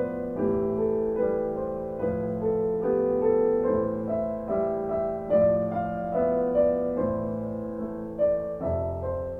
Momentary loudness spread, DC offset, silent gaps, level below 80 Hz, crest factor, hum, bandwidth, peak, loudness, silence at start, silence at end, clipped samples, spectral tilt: 8 LU; under 0.1%; none; -48 dBFS; 14 dB; none; 3.2 kHz; -12 dBFS; -27 LUFS; 0 s; 0 s; under 0.1%; -11 dB/octave